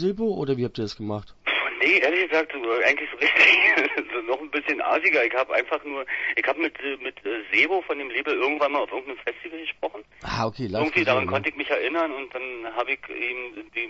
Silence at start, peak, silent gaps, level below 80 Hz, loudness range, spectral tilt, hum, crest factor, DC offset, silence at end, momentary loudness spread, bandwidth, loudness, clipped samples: 0 s; -4 dBFS; none; -58 dBFS; 6 LU; -5 dB/octave; none; 20 dB; under 0.1%; 0 s; 13 LU; 8 kHz; -23 LUFS; under 0.1%